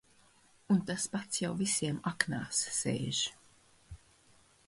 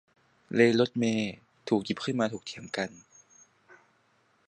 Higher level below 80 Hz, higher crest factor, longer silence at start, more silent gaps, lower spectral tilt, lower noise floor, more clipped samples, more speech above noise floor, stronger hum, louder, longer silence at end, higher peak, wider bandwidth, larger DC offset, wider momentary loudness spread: first, -64 dBFS vs -70 dBFS; about the same, 26 dB vs 22 dB; first, 0.7 s vs 0.5 s; neither; second, -3.5 dB/octave vs -5.5 dB/octave; about the same, -65 dBFS vs -68 dBFS; neither; second, 31 dB vs 40 dB; neither; second, -33 LUFS vs -29 LUFS; second, 0.7 s vs 1.55 s; about the same, -10 dBFS vs -8 dBFS; first, 11.5 kHz vs 9.8 kHz; neither; second, 4 LU vs 14 LU